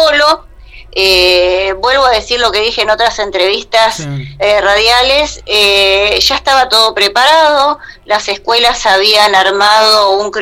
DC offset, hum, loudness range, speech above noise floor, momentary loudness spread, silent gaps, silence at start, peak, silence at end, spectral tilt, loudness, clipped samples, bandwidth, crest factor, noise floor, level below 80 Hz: under 0.1%; none; 2 LU; 24 dB; 7 LU; none; 0 s; 0 dBFS; 0 s; -2 dB/octave; -8 LUFS; under 0.1%; 16.5 kHz; 10 dB; -33 dBFS; -34 dBFS